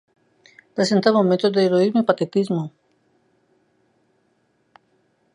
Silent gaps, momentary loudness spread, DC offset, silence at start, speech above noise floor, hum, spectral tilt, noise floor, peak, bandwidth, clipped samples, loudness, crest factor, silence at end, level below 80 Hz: none; 9 LU; under 0.1%; 0.75 s; 47 dB; none; -6 dB/octave; -66 dBFS; -2 dBFS; 11 kHz; under 0.1%; -19 LUFS; 22 dB; 2.65 s; -72 dBFS